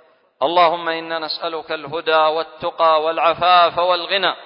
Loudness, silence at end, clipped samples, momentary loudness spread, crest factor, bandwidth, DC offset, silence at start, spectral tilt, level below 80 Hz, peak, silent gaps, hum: -17 LUFS; 0 s; under 0.1%; 11 LU; 16 dB; 5.4 kHz; under 0.1%; 0.4 s; -8 dB/octave; -60 dBFS; -2 dBFS; none; none